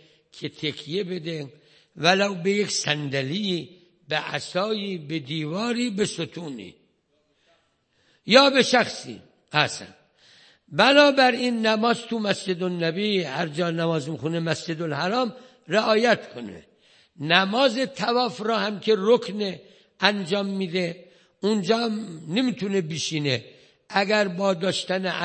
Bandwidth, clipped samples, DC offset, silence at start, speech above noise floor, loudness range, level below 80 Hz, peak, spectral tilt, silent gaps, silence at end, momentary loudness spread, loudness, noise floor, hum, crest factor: 8.8 kHz; under 0.1%; under 0.1%; 0.35 s; 45 dB; 6 LU; -72 dBFS; 0 dBFS; -4.5 dB/octave; none; 0 s; 13 LU; -23 LUFS; -68 dBFS; none; 24 dB